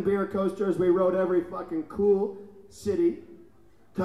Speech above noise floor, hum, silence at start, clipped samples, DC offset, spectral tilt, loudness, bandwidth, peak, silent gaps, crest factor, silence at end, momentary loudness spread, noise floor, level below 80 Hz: 33 dB; none; 0 s; under 0.1%; 0.2%; -8 dB/octave; -26 LUFS; 11.5 kHz; -14 dBFS; none; 14 dB; 0 s; 12 LU; -59 dBFS; -58 dBFS